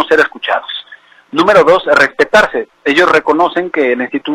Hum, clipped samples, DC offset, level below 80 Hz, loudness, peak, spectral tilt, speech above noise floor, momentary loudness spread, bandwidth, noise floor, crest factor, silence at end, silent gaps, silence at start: none; 0.2%; under 0.1%; -48 dBFS; -11 LUFS; 0 dBFS; -4 dB/octave; 29 dB; 9 LU; 15.5 kHz; -40 dBFS; 12 dB; 0 s; none; 0 s